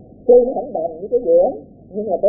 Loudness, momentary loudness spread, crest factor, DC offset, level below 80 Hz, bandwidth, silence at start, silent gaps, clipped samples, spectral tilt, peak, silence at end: -16 LUFS; 15 LU; 14 dB; under 0.1%; -50 dBFS; 0.9 kHz; 0.25 s; none; under 0.1%; -16.5 dB/octave; -2 dBFS; 0 s